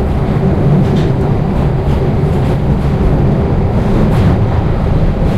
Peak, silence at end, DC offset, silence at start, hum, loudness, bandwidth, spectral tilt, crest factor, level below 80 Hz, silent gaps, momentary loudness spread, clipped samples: -2 dBFS; 0 s; under 0.1%; 0 s; none; -12 LUFS; 11 kHz; -9 dB/octave; 8 dB; -16 dBFS; none; 3 LU; under 0.1%